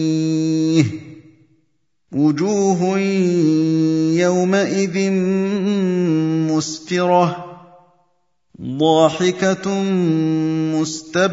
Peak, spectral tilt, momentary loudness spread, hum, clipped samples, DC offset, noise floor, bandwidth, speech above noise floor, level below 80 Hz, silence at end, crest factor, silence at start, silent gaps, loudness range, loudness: 0 dBFS; -6 dB/octave; 6 LU; none; under 0.1%; under 0.1%; -69 dBFS; 7.8 kHz; 52 dB; -62 dBFS; 0 s; 18 dB; 0 s; none; 2 LU; -17 LUFS